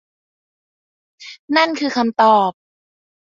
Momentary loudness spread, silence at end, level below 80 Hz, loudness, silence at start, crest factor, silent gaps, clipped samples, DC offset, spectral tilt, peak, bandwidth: 18 LU; 0.75 s; -68 dBFS; -16 LUFS; 1.2 s; 18 dB; 1.39-1.48 s; under 0.1%; under 0.1%; -4.5 dB/octave; -2 dBFS; 7.8 kHz